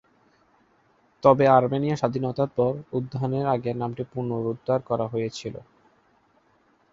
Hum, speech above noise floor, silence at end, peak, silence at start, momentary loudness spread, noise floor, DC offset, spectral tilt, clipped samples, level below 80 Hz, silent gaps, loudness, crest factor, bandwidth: none; 40 dB; 1.35 s; -2 dBFS; 1.25 s; 12 LU; -63 dBFS; under 0.1%; -7.5 dB/octave; under 0.1%; -60 dBFS; none; -24 LUFS; 22 dB; 7.6 kHz